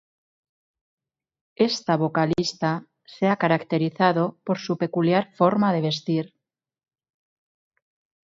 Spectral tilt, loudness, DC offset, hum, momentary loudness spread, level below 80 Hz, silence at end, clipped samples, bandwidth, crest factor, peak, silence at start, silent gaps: -6 dB/octave; -23 LUFS; under 0.1%; none; 6 LU; -64 dBFS; 2 s; under 0.1%; 7.8 kHz; 20 dB; -4 dBFS; 1.6 s; none